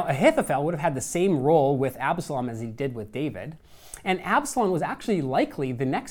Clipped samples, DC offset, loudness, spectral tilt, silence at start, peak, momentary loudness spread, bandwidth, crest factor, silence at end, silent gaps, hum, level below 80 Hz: under 0.1%; under 0.1%; -25 LUFS; -5.5 dB/octave; 0 s; -6 dBFS; 11 LU; 19.5 kHz; 18 dB; 0 s; none; none; -54 dBFS